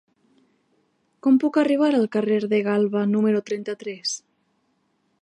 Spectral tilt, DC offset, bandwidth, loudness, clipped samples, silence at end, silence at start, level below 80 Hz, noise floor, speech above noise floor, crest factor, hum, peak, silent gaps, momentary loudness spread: -5.5 dB/octave; under 0.1%; 10.5 kHz; -22 LUFS; under 0.1%; 1.05 s; 1.25 s; -76 dBFS; -69 dBFS; 48 dB; 14 dB; none; -8 dBFS; none; 10 LU